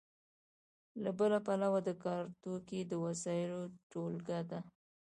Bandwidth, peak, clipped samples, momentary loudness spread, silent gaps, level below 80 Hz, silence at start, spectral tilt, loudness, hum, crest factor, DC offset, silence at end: 11 kHz; -22 dBFS; under 0.1%; 12 LU; 3.83-3.90 s; -80 dBFS; 0.95 s; -6.5 dB/octave; -39 LUFS; none; 16 dB; under 0.1%; 0.35 s